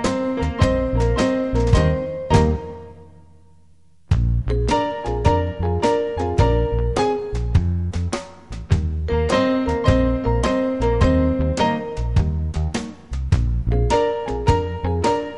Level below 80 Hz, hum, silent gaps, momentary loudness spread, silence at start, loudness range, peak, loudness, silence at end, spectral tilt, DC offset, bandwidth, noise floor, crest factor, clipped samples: -26 dBFS; none; none; 7 LU; 0 s; 3 LU; -2 dBFS; -20 LUFS; 0 s; -7 dB/octave; 0.4%; 11 kHz; -56 dBFS; 18 dB; under 0.1%